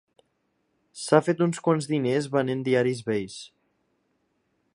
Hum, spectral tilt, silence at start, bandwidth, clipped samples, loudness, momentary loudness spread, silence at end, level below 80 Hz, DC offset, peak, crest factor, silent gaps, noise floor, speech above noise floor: none; -6 dB/octave; 0.95 s; 11.5 kHz; under 0.1%; -25 LUFS; 11 LU; 1.25 s; -68 dBFS; under 0.1%; -4 dBFS; 24 dB; none; -73 dBFS; 49 dB